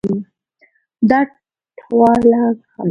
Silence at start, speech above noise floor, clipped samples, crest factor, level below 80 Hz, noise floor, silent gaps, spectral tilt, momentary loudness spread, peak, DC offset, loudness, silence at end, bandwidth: 0.05 s; 44 dB; under 0.1%; 16 dB; -52 dBFS; -57 dBFS; none; -8.5 dB/octave; 11 LU; 0 dBFS; under 0.1%; -15 LUFS; 0 s; 6.2 kHz